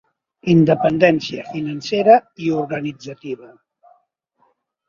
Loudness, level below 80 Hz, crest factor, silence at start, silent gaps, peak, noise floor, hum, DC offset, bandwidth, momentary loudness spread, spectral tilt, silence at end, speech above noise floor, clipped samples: -17 LUFS; -58 dBFS; 20 dB; 0.45 s; none; 0 dBFS; -64 dBFS; none; under 0.1%; 7.4 kHz; 17 LU; -7 dB/octave; 1.4 s; 47 dB; under 0.1%